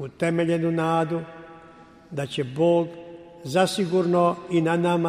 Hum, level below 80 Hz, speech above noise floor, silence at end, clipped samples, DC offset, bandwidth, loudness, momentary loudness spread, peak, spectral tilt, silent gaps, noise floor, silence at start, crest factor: none; -62 dBFS; 26 dB; 0 s; under 0.1%; under 0.1%; 15.5 kHz; -23 LUFS; 18 LU; -8 dBFS; -6.5 dB/octave; none; -49 dBFS; 0 s; 16 dB